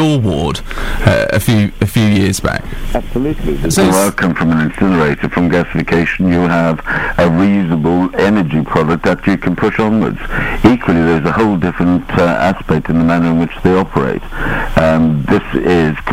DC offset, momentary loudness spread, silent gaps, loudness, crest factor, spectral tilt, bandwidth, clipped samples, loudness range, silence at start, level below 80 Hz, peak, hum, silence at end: under 0.1%; 6 LU; none; -13 LUFS; 12 dB; -6 dB/octave; 16.5 kHz; under 0.1%; 1 LU; 0 s; -26 dBFS; 0 dBFS; none; 0 s